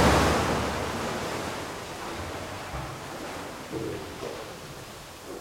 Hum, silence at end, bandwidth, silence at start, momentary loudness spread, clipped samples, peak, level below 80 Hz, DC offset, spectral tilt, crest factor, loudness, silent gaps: none; 0 s; 16.5 kHz; 0 s; 16 LU; under 0.1%; -8 dBFS; -42 dBFS; under 0.1%; -4.5 dB/octave; 20 dB; -31 LUFS; none